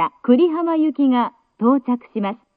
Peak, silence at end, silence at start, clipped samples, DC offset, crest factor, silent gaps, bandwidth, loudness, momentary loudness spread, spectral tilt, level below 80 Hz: -4 dBFS; 0.2 s; 0 s; under 0.1%; under 0.1%; 14 dB; none; 4.4 kHz; -19 LUFS; 10 LU; -10.5 dB/octave; -74 dBFS